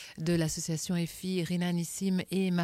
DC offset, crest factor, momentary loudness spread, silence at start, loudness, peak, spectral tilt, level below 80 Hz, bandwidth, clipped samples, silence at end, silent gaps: under 0.1%; 12 dB; 3 LU; 0 s; -32 LUFS; -18 dBFS; -5.5 dB/octave; -58 dBFS; 15.5 kHz; under 0.1%; 0 s; none